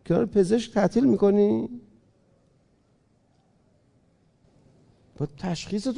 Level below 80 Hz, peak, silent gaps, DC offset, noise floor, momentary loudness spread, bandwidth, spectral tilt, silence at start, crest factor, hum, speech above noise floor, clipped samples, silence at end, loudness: -56 dBFS; -10 dBFS; none; under 0.1%; -64 dBFS; 15 LU; 10.5 kHz; -7 dB/octave; 0.05 s; 16 dB; none; 42 dB; under 0.1%; 0 s; -24 LUFS